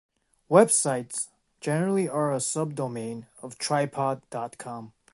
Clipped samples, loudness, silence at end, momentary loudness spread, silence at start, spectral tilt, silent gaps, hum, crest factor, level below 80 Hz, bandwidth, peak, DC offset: under 0.1%; -26 LUFS; 0.25 s; 17 LU; 0.5 s; -4.5 dB/octave; none; none; 24 dB; -72 dBFS; 12 kHz; -4 dBFS; under 0.1%